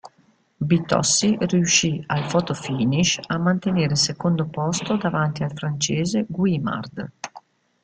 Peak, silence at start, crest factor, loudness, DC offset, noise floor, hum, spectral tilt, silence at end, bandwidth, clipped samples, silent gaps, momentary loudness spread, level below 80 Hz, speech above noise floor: -4 dBFS; 0.05 s; 18 dB; -21 LUFS; under 0.1%; -60 dBFS; none; -4 dB/octave; 0.45 s; 9.6 kHz; under 0.1%; none; 10 LU; -54 dBFS; 39 dB